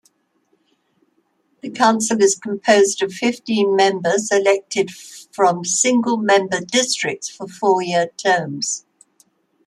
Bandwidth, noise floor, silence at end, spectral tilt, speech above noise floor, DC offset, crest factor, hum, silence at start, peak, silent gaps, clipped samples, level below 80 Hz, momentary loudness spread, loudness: 13 kHz; -65 dBFS; 0.85 s; -3 dB/octave; 47 dB; under 0.1%; 18 dB; none; 1.65 s; -2 dBFS; none; under 0.1%; -68 dBFS; 9 LU; -18 LUFS